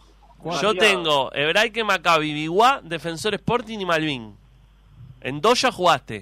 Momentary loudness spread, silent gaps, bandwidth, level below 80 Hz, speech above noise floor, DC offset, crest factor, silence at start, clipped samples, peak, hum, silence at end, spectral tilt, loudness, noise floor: 12 LU; none; 16 kHz; -52 dBFS; 31 dB; under 0.1%; 16 dB; 0.45 s; under 0.1%; -6 dBFS; none; 0 s; -3.5 dB/octave; -20 LUFS; -52 dBFS